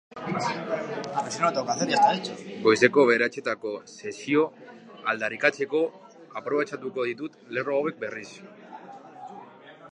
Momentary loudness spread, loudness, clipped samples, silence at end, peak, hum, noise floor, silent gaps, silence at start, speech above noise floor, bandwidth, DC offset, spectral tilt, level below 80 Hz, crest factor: 23 LU; -26 LUFS; under 0.1%; 0 s; -2 dBFS; none; -48 dBFS; none; 0.1 s; 22 dB; 10.5 kHz; under 0.1%; -4 dB/octave; -76 dBFS; 26 dB